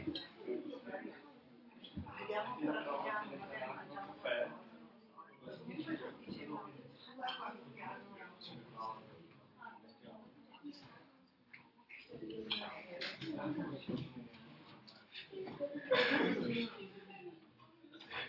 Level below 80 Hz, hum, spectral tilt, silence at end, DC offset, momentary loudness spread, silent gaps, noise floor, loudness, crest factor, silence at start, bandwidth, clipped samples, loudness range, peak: -80 dBFS; none; -2.5 dB/octave; 0 s; under 0.1%; 20 LU; none; -68 dBFS; -43 LUFS; 24 dB; 0 s; 6 kHz; under 0.1%; 14 LU; -20 dBFS